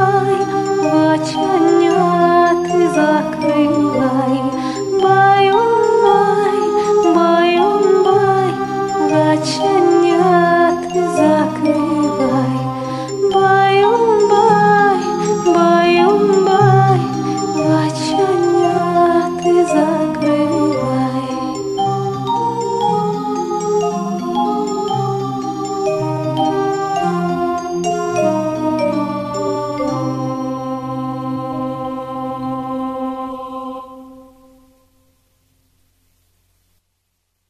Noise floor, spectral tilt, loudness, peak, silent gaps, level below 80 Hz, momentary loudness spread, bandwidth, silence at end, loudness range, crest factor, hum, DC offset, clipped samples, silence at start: -69 dBFS; -6 dB/octave; -15 LUFS; 0 dBFS; none; -52 dBFS; 11 LU; 12 kHz; 3.3 s; 10 LU; 14 dB; none; under 0.1%; under 0.1%; 0 s